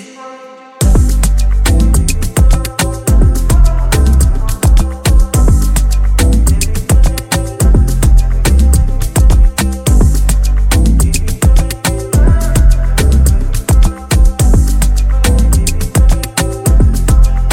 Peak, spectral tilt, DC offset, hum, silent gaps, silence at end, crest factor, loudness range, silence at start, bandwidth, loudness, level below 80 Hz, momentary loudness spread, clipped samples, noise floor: 0 dBFS; -5 dB/octave; under 0.1%; none; none; 0 s; 8 dB; 1 LU; 0 s; 17 kHz; -12 LUFS; -10 dBFS; 4 LU; under 0.1%; -33 dBFS